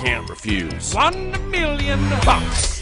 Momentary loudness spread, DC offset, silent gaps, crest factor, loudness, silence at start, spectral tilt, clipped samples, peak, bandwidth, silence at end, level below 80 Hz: 7 LU; under 0.1%; none; 18 dB; -20 LUFS; 0 s; -4 dB/octave; under 0.1%; -2 dBFS; 11 kHz; 0 s; -26 dBFS